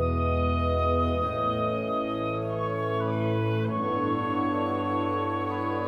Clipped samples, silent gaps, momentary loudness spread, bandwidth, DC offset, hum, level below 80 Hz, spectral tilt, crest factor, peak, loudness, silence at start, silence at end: under 0.1%; none; 4 LU; 5.4 kHz; under 0.1%; none; -40 dBFS; -9 dB/octave; 14 dB; -12 dBFS; -27 LUFS; 0 s; 0 s